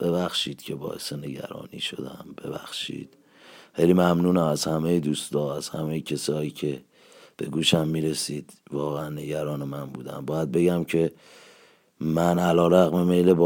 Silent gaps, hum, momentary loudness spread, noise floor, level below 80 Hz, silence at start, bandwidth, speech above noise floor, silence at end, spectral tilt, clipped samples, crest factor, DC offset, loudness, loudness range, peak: none; none; 16 LU; -56 dBFS; -58 dBFS; 0 s; 17 kHz; 32 dB; 0 s; -5.5 dB/octave; under 0.1%; 20 dB; under 0.1%; -25 LUFS; 5 LU; -4 dBFS